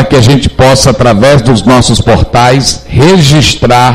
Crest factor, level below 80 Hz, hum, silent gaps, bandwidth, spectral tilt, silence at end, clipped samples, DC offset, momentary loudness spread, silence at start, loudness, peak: 4 dB; -20 dBFS; none; none; 16 kHz; -5 dB/octave; 0 s; 5%; under 0.1%; 3 LU; 0 s; -5 LUFS; 0 dBFS